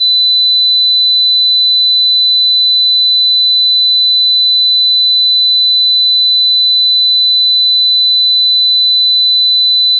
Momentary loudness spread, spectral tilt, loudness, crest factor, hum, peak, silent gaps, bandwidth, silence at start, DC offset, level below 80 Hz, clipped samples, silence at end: 0 LU; 8.5 dB/octave; -6 LUFS; 4 dB; none; -6 dBFS; none; 4.4 kHz; 0 s; under 0.1%; under -90 dBFS; under 0.1%; 0 s